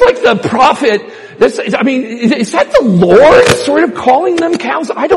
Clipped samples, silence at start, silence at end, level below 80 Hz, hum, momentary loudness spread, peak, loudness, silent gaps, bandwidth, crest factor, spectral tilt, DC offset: 0.8%; 0 s; 0 s; -40 dBFS; none; 9 LU; 0 dBFS; -9 LUFS; none; 13 kHz; 8 dB; -5 dB/octave; under 0.1%